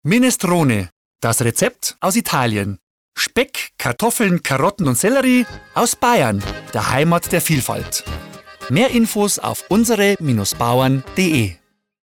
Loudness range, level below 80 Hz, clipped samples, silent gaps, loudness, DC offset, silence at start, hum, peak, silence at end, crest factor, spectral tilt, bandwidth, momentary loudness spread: 2 LU; -44 dBFS; under 0.1%; 0.92-1.14 s, 2.83-3.12 s; -17 LUFS; under 0.1%; 0.05 s; none; -6 dBFS; 0.5 s; 12 dB; -4.5 dB/octave; 19 kHz; 9 LU